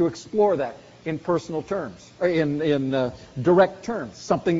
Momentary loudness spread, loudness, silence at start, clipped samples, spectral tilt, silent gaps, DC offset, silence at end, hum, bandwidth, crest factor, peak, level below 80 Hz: 12 LU; -24 LUFS; 0 s; under 0.1%; -6 dB/octave; none; under 0.1%; 0 s; none; 7.8 kHz; 18 dB; -4 dBFS; -56 dBFS